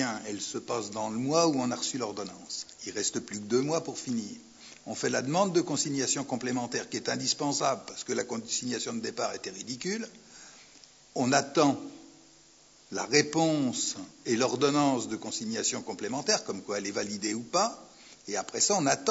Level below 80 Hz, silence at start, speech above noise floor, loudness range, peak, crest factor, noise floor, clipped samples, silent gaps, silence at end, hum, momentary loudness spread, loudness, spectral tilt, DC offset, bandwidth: -74 dBFS; 0 s; 28 dB; 4 LU; -8 dBFS; 22 dB; -58 dBFS; under 0.1%; none; 0 s; none; 12 LU; -30 LUFS; -3 dB/octave; under 0.1%; 8 kHz